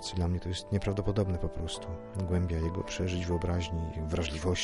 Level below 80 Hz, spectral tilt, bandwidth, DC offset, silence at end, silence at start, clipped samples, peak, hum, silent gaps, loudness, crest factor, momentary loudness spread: -42 dBFS; -6 dB/octave; 11.5 kHz; under 0.1%; 0 s; 0 s; under 0.1%; -16 dBFS; none; none; -33 LUFS; 16 dB; 6 LU